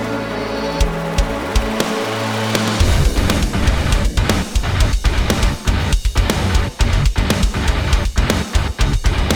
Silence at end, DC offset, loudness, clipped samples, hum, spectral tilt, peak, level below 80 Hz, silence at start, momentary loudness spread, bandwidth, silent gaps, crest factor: 0 s; under 0.1%; -18 LUFS; under 0.1%; none; -5 dB/octave; -2 dBFS; -18 dBFS; 0 s; 3 LU; 19 kHz; none; 14 dB